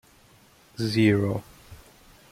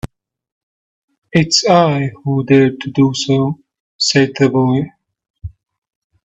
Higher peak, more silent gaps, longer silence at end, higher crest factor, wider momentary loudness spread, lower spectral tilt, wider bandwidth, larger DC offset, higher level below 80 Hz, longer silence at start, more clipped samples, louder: second, -8 dBFS vs 0 dBFS; second, none vs 0.52-1.08 s, 1.18-1.22 s, 3.80-3.99 s, 5.30-5.34 s; second, 0.55 s vs 0.75 s; about the same, 20 dB vs 16 dB; second, 14 LU vs 21 LU; first, -7 dB/octave vs -5 dB/octave; first, 15.5 kHz vs 8.4 kHz; neither; second, -58 dBFS vs -46 dBFS; first, 0.8 s vs 0.05 s; neither; second, -24 LUFS vs -14 LUFS